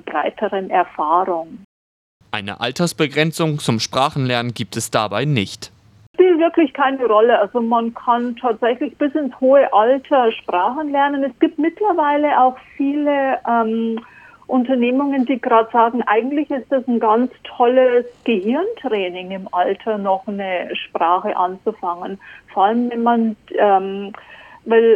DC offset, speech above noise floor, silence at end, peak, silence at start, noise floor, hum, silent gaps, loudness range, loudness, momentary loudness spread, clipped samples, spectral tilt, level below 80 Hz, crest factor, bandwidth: under 0.1%; over 73 dB; 0 s; -2 dBFS; 0.05 s; under -90 dBFS; none; 1.64-2.20 s, 6.07-6.14 s; 4 LU; -18 LUFS; 10 LU; under 0.1%; -5.5 dB/octave; -62 dBFS; 16 dB; 14 kHz